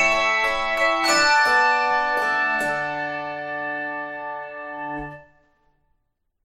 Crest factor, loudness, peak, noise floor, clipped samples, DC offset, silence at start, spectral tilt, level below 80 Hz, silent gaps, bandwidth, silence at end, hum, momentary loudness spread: 16 dB; -21 LUFS; -6 dBFS; -72 dBFS; under 0.1%; under 0.1%; 0 s; -1.5 dB/octave; -52 dBFS; none; 16 kHz; 1.2 s; none; 16 LU